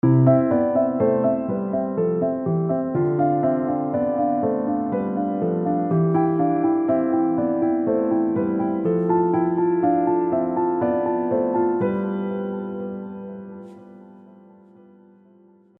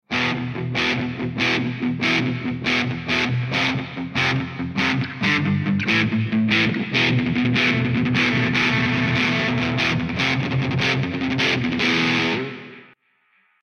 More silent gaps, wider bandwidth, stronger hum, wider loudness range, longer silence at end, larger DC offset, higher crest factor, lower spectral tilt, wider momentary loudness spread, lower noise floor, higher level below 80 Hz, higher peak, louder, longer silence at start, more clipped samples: neither; second, 3.2 kHz vs 9.2 kHz; neither; first, 6 LU vs 3 LU; first, 1.6 s vs 0.8 s; neither; about the same, 18 dB vs 16 dB; first, -13 dB/octave vs -5.5 dB/octave; about the same, 8 LU vs 6 LU; second, -53 dBFS vs -63 dBFS; second, -60 dBFS vs -50 dBFS; about the same, -4 dBFS vs -4 dBFS; about the same, -21 LUFS vs -20 LUFS; about the same, 0.05 s vs 0.1 s; neither